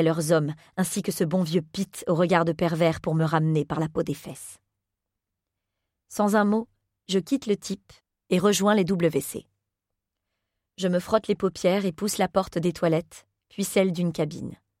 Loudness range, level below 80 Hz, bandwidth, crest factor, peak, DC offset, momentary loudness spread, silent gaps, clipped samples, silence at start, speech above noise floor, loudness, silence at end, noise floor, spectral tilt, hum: 4 LU; -60 dBFS; 16.5 kHz; 20 dB; -6 dBFS; under 0.1%; 13 LU; none; under 0.1%; 0 s; 60 dB; -25 LUFS; 0.25 s; -85 dBFS; -5.5 dB/octave; none